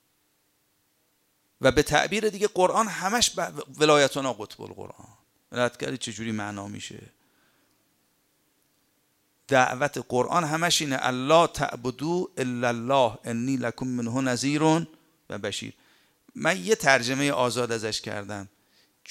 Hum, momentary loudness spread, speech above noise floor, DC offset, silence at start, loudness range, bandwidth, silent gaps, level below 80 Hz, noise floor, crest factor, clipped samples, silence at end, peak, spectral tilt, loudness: none; 16 LU; 44 dB; under 0.1%; 1.6 s; 10 LU; 16 kHz; none; -56 dBFS; -70 dBFS; 24 dB; under 0.1%; 0.65 s; -4 dBFS; -3.5 dB/octave; -25 LUFS